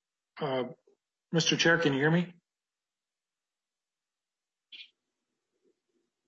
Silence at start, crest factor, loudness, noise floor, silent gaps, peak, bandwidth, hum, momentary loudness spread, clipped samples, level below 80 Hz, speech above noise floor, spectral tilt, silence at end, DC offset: 0.35 s; 22 dB; -28 LUFS; under -90 dBFS; none; -12 dBFS; 7.6 kHz; none; 24 LU; under 0.1%; -76 dBFS; over 62 dB; -4.5 dB/octave; 1.45 s; under 0.1%